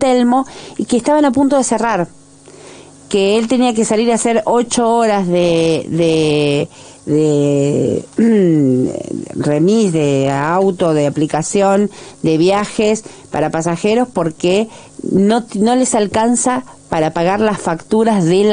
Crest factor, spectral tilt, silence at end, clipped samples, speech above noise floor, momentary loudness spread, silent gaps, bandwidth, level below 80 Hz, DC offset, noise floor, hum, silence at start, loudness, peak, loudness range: 12 dB; -5.5 dB/octave; 0 s; under 0.1%; 26 dB; 7 LU; none; 10.5 kHz; -48 dBFS; under 0.1%; -39 dBFS; none; 0 s; -14 LUFS; -2 dBFS; 2 LU